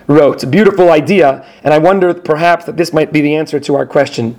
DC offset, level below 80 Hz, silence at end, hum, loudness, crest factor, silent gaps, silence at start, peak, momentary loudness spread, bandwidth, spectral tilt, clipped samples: under 0.1%; -48 dBFS; 0.05 s; none; -11 LUFS; 10 dB; none; 0.1 s; 0 dBFS; 7 LU; 16.5 kHz; -6.5 dB/octave; 0.7%